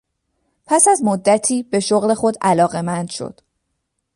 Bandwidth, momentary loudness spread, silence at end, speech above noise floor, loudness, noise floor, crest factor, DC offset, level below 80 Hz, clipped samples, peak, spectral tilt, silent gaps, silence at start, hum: 11.5 kHz; 12 LU; 0.85 s; 57 dB; -16 LUFS; -73 dBFS; 18 dB; under 0.1%; -60 dBFS; under 0.1%; 0 dBFS; -4 dB/octave; none; 0.7 s; none